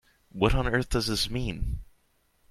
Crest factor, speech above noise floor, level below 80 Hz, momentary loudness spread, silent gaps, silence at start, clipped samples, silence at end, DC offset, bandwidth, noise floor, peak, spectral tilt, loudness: 22 dB; 41 dB; -34 dBFS; 12 LU; none; 0.35 s; under 0.1%; 0.65 s; under 0.1%; 15 kHz; -68 dBFS; -6 dBFS; -5 dB/octave; -28 LUFS